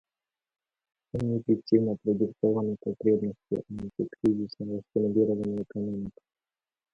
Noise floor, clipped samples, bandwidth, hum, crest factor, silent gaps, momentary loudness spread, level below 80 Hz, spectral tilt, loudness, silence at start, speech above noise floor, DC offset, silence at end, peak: under -90 dBFS; under 0.1%; 6.6 kHz; none; 20 dB; none; 10 LU; -60 dBFS; -10 dB/octave; -29 LUFS; 1.15 s; over 62 dB; under 0.1%; 0.85 s; -8 dBFS